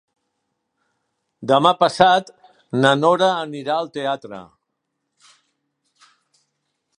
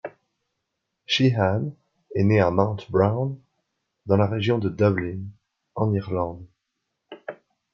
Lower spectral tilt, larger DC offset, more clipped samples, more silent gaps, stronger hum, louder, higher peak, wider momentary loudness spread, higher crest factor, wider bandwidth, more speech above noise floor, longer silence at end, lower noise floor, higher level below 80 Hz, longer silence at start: second, -5 dB/octave vs -7 dB/octave; neither; neither; neither; neither; first, -18 LUFS vs -23 LUFS; first, 0 dBFS vs -4 dBFS; second, 14 LU vs 20 LU; about the same, 22 dB vs 22 dB; first, 11 kHz vs 7.2 kHz; about the same, 59 dB vs 58 dB; first, 2.55 s vs 0.4 s; about the same, -77 dBFS vs -80 dBFS; about the same, -62 dBFS vs -60 dBFS; first, 1.4 s vs 0.05 s